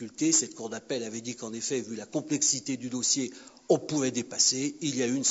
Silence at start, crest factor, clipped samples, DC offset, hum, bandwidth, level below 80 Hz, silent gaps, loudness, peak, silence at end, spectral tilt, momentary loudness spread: 0 s; 20 dB; under 0.1%; under 0.1%; none; 8.2 kHz; -76 dBFS; none; -28 LUFS; -10 dBFS; 0 s; -2.5 dB/octave; 12 LU